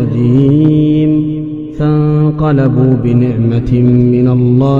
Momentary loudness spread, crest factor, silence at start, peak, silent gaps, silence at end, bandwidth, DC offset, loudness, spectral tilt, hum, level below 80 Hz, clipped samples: 5 LU; 10 dB; 0 s; 0 dBFS; none; 0 s; 4.4 kHz; under 0.1%; -10 LUFS; -11 dB/octave; none; -32 dBFS; 0.4%